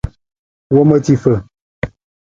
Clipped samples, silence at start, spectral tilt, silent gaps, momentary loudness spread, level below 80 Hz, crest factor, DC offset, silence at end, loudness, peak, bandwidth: under 0.1%; 0.05 s; -8.5 dB/octave; 0.39-0.70 s, 1.61-1.82 s; 15 LU; -36 dBFS; 16 dB; under 0.1%; 0.35 s; -13 LUFS; 0 dBFS; 7.6 kHz